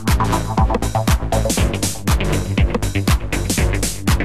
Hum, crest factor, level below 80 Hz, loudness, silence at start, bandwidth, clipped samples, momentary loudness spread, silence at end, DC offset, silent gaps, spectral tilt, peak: none; 12 dB; -22 dBFS; -19 LUFS; 0 s; 14.5 kHz; under 0.1%; 2 LU; 0 s; 2%; none; -5 dB/octave; -6 dBFS